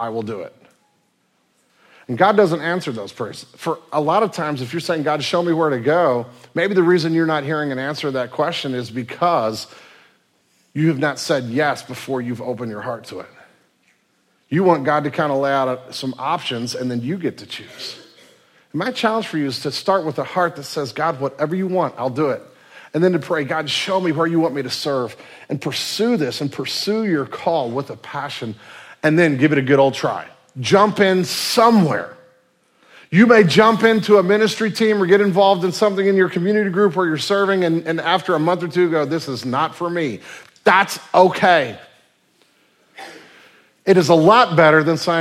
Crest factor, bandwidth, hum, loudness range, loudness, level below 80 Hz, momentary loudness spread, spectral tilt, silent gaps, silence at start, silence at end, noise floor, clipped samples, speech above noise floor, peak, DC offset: 18 dB; 16 kHz; none; 8 LU; -18 LUFS; -66 dBFS; 15 LU; -5.5 dB/octave; none; 0 s; 0 s; -64 dBFS; under 0.1%; 46 dB; 0 dBFS; under 0.1%